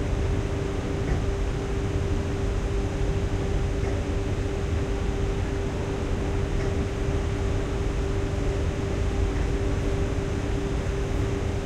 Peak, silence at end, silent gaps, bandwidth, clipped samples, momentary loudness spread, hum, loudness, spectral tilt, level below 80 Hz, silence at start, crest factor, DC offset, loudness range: -12 dBFS; 0 s; none; 11 kHz; under 0.1%; 2 LU; none; -28 LUFS; -6.5 dB/octave; -30 dBFS; 0 s; 14 dB; under 0.1%; 1 LU